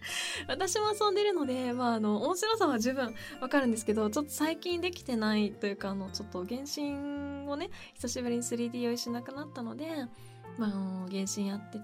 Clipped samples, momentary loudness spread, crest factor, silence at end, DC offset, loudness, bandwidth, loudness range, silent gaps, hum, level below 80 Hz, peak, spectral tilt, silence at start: under 0.1%; 10 LU; 18 dB; 0 s; under 0.1%; -33 LUFS; 16 kHz; 6 LU; none; none; -64 dBFS; -16 dBFS; -4 dB/octave; 0 s